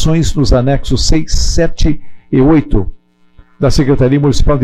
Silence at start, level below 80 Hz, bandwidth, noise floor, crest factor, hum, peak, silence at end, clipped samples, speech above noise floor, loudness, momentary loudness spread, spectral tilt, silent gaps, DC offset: 0 s; -16 dBFS; 11.5 kHz; -43 dBFS; 8 dB; none; -2 dBFS; 0 s; under 0.1%; 34 dB; -12 LUFS; 7 LU; -6 dB/octave; none; under 0.1%